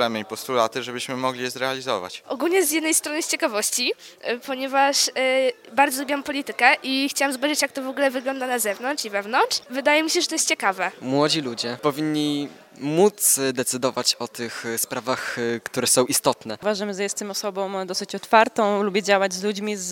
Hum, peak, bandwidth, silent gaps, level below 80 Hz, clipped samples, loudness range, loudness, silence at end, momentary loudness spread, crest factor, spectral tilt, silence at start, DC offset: none; 0 dBFS; 18 kHz; none; -72 dBFS; under 0.1%; 2 LU; -22 LUFS; 0 s; 9 LU; 22 dB; -2 dB/octave; 0 s; under 0.1%